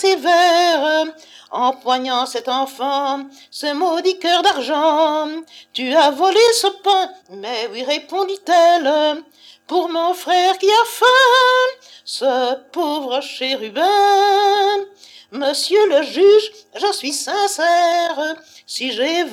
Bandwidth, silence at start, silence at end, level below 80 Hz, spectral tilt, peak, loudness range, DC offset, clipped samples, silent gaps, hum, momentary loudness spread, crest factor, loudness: 16.5 kHz; 0 s; 0 s; -80 dBFS; -0.5 dB/octave; -2 dBFS; 3 LU; under 0.1%; under 0.1%; none; none; 13 LU; 14 dB; -16 LUFS